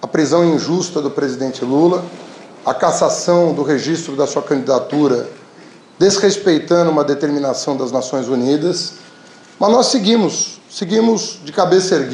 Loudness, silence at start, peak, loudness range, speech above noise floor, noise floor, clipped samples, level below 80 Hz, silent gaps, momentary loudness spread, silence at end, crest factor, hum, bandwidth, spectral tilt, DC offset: -16 LUFS; 0 s; -2 dBFS; 1 LU; 27 dB; -42 dBFS; under 0.1%; -62 dBFS; none; 9 LU; 0 s; 14 dB; none; 11 kHz; -4.5 dB/octave; under 0.1%